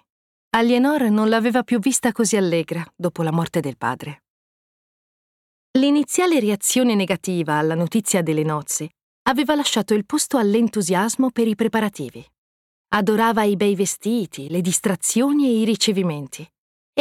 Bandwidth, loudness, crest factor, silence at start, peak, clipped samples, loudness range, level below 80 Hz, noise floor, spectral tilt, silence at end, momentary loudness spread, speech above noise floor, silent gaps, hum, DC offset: 16.5 kHz; -20 LUFS; 14 dB; 0.55 s; -6 dBFS; under 0.1%; 4 LU; -62 dBFS; under -90 dBFS; -4.5 dB/octave; 0 s; 8 LU; over 71 dB; 4.30-5.74 s, 9.03-9.25 s, 12.38-12.84 s, 16.58-16.93 s; none; under 0.1%